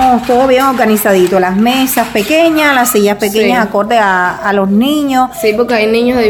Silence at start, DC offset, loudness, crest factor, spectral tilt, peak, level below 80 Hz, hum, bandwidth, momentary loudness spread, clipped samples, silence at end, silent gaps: 0 s; under 0.1%; -10 LUFS; 10 dB; -4 dB/octave; 0 dBFS; -40 dBFS; none; 18 kHz; 4 LU; under 0.1%; 0 s; none